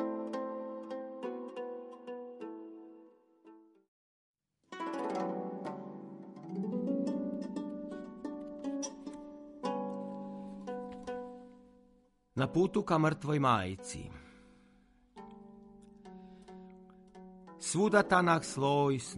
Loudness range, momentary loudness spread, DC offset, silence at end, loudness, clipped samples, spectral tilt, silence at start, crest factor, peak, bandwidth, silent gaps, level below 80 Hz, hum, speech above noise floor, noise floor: 14 LU; 24 LU; under 0.1%; 0 s; -35 LUFS; under 0.1%; -5.5 dB/octave; 0 s; 24 dB; -12 dBFS; 11.5 kHz; 3.88-4.34 s; -68 dBFS; none; 38 dB; -68 dBFS